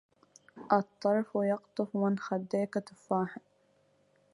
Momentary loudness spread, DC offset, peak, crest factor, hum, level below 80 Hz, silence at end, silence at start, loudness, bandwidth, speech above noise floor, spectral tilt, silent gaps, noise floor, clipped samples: 9 LU; under 0.1%; -10 dBFS; 22 dB; none; -78 dBFS; 0.95 s; 0.55 s; -32 LUFS; 11.5 kHz; 38 dB; -7.5 dB/octave; none; -69 dBFS; under 0.1%